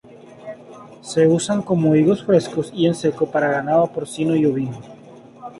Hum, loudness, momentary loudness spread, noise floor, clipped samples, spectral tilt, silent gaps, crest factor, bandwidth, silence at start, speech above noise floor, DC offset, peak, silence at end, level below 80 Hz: none; -19 LUFS; 21 LU; -43 dBFS; under 0.1%; -6.5 dB/octave; none; 16 dB; 11.5 kHz; 0.15 s; 25 dB; under 0.1%; -4 dBFS; 0 s; -60 dBFS